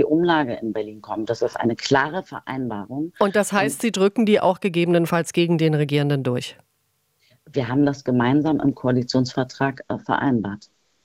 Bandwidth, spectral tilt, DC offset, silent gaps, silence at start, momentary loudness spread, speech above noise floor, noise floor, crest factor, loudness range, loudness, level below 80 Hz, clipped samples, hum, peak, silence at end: 16 kHz; -6 dB/octave; under 0.1%; none; 0 s; 11 LU; 48 dB; -69 dBFS; 18 dB; 3 LU; -21 LUFS; -58 dBFS; under 0.1%; none; -2 dBFS; 0.45 s